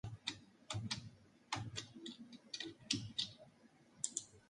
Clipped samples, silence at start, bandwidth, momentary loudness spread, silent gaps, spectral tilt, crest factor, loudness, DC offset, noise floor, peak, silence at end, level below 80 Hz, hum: under 0.1%; 0.05 s; 11.5 kHz; 16 LU; none; -2.5 dB/octave; 30 dB; -45 LUFS; under 0.1%; -68 dBFS; -18 dBFS; 0.05 s; -70 dBFS; none